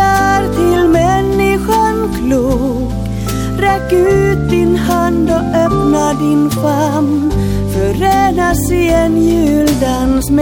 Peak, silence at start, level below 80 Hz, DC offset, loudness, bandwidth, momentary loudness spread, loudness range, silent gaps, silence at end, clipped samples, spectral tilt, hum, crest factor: 0 dBFS; 0 s; -24 dBFS; under 0.1%; -12 LUFS; 17.5 kHz; 4 LU; 1 LU; none; 0 s; under 0.1%; -6 dB/octave; none; 10 dB